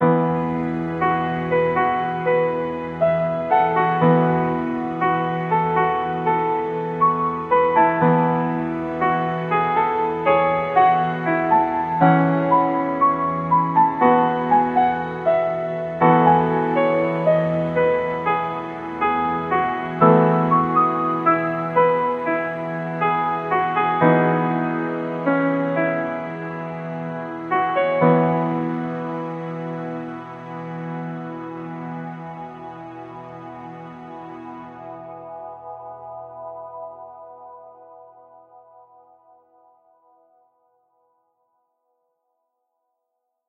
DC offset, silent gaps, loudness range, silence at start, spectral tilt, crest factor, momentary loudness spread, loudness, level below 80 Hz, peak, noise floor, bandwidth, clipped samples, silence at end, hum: under 0.1%; none; 18 LU; 0 s; -9.5 dB/octave; 20 dB; 19 LU; -20 LUFS; -56 dBFS; 0 dBFS; -78 dBFS; 4.7 kHz; under 0.1%; 5.45 s; none